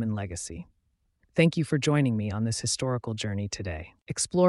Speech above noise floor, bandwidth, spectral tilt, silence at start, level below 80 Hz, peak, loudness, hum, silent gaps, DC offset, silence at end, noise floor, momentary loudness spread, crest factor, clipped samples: 44 dB; 11.5 kHz; -5 dB/octave; 0 s; -52 dBFS; -10 dBFS; -28 LUFS; none; 4.02-4.06 s; under 0.1%; 0 s; -71 dBFS; 12 LU; 18 dB; under 0.1%